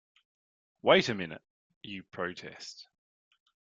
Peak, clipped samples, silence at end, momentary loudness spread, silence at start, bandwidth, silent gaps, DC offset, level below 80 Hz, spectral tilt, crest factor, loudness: -8 dBFS; under 0.1%; 0.85 s; 24 LU; 0.85 s; 7.8 kHz; 1.50-1.70 s, 1.76-1.81 s; under 0.1%; -72 dBFS; -4.5 dB/octave; 28 dB; -29 LUFS